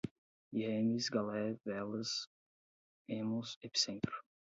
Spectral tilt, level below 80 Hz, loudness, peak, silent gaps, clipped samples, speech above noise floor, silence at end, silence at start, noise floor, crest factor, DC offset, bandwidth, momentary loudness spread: -4 dB/octave; -74 dBFS; -38 LUFS; -20 dBFS; 0.11-0.51 s, 2.27-3.05 s, 3.56-3.61 s; under 0.1%; over 52 dB; 0.3 s; 0.05 s; under -90 dBFS; 20 dB; under 0.1%; 7.6 kHz; 8 LU